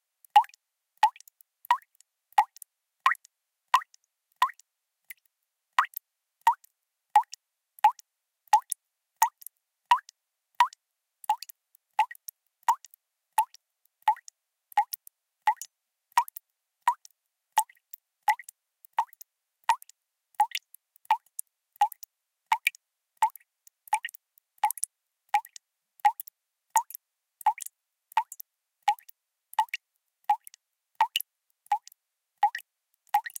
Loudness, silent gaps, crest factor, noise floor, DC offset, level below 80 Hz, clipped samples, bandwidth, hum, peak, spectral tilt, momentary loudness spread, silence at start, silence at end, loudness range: -29 LUFS; none; 28 dB; -82 dBFS; under 0.1%; under -90 dBFS; under 0.1%; 17 kHz; none; -4 dBFS; 4.5 dB/octave; 18 LU; 0.35 s; 0.2 s; 4 LU